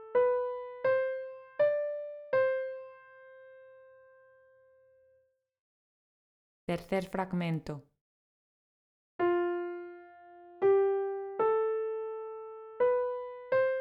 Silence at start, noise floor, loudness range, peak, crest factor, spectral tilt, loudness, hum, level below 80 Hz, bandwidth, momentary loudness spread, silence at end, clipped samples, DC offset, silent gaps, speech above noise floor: 0 s; -72 dBFS; 9 LU; -18 dBFS; 16 dB; -8 dB/octave; -32 LUFS; none; -70 dBFS; 11 kHz; 16 LU; 0 s; under 0.1%; under 0.1%; 5.59-6.67 s, 8.01-9.19 s; 37 dB